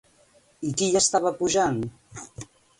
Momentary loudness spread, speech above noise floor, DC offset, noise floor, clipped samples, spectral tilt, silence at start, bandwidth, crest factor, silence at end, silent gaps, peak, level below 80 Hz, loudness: 21 LU; 36 dB; under 0.1%; -60 dBFS; under 0.1%; -3.5 dB/octave; 0.6 s; 11.5 kHz; 20 dB; 0.35 s; none; -8 dBFS; -56 dBFS; -23 LUFS